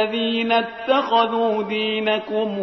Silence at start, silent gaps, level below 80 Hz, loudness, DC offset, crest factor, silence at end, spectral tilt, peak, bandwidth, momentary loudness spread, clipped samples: 0 s; none; -64 dBFS; -20 LUFS; under 0.1%; 16 dB; 0 s; -6 dB/octave; -6 dBFS; 6.2 kHz; 4 LU; under 0.1%